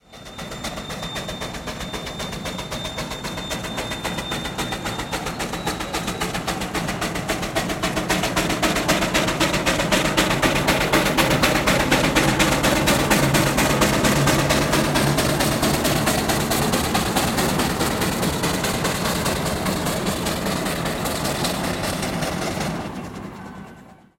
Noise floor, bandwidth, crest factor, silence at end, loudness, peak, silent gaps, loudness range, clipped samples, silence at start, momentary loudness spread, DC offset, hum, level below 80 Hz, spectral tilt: -45 dBFS; 16.5 kHz; 20 dB; 0.25 s; -21 LUFS; -2 dBFS; none; 9 LU; under 0.1%; 0.1 s; 12 LU; under 0.1%; none; -38 dBFS; -4 dB/octave